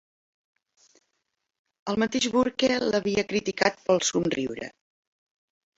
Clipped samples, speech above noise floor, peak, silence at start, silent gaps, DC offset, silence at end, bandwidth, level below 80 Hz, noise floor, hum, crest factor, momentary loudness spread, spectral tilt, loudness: under 0.1%; 54 dB; -6 dBFS; 1.85 s; none; under 0.1%; 1.1 s; 8 kHz; -60 dBFS; -80 dBFS; none; 24 dB; 10 LU; -3.5 dB/octave; -25 LUFS